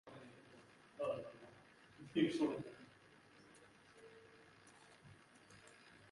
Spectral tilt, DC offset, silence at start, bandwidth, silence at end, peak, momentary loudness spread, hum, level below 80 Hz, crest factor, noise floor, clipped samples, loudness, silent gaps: -6 dB/octave; under 0.1%; 0.05 s; 11.5 kHz; 0.2 s; -24 dBFS; 25 LU; none; -82 dBFS; 24 dB; -66 dBFS; under 0.1%; -42 LUFS; none